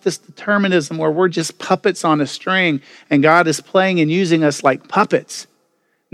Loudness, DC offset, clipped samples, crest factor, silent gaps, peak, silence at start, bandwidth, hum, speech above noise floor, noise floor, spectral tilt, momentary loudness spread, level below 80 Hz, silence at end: -16 LUFS; under 0.1%; under 0.1%; 16 dB; none; 0 dBFS; 0.05 s; 14.5 kHz; none; 48 dB; -65 dBFS; -5 dB/octave; 9 LU; -70 dBFS; 0.7 s